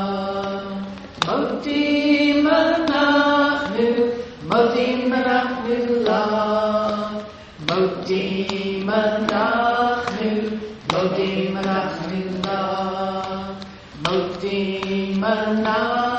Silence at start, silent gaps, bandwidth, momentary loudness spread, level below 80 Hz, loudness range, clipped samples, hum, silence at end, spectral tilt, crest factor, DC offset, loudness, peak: 0 s; none; 8.4 kHz; 11 LU; -52 dBFS; 6 LU; under 0.1%; none; 0 s; -6 dB/octave; 20 dB; under 0.1%; -21 LUFS; 0 dBFS